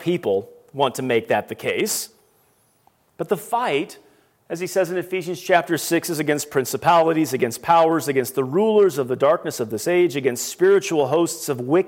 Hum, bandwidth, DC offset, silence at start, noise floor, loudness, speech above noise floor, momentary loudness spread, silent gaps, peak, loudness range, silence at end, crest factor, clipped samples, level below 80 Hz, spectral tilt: none; 17 kHz; under 0.1%; 0 s; -61 dBFS; -20 LUFS; 41 dB; 9 LU; none; -2 dBFS; 7 LU; 0 s; 18 dB; under 0.1%; -68 dBFS; -4.5 dB/octave